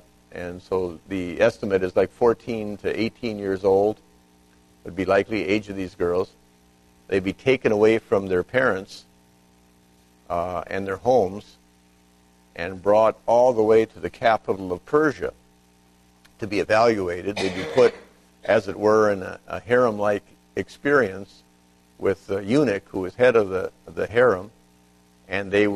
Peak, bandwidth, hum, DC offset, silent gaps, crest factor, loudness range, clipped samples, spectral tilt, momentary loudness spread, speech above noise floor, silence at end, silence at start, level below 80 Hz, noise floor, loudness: -4 dBFS; 13 kHz; 60 Hz at -55 dBFS; under 0.1%; none; 18 dB; 4 LU; under 0.1%; -6 dB/octave; 14 LU; 36 dB; 0 s; 0.35 s; -54 dBFS; -57 dBFS; -22 LUFS